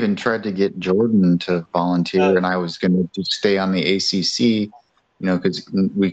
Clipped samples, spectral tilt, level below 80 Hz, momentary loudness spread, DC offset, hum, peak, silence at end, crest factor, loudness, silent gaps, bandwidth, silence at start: under 0.1%; -5.5 dB/octave; -60 dBFS; 5 LU; under 0.1%; none; -2 dBFS; 0 s; 16 dB; -19 LUFS; none; 8.2 kHz; 0 s